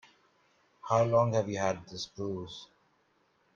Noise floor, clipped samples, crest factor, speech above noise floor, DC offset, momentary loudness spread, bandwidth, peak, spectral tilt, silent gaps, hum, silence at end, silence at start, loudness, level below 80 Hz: -71 dBFS; under 0.1%; 20 dB; 41 dB; under 0.1%; 19 LU; 7.2 kHz; -12 dBFS; -6 dB/octave; none; none; 0.9 s; 0.85 s; -31 LUFS; -68 dBFS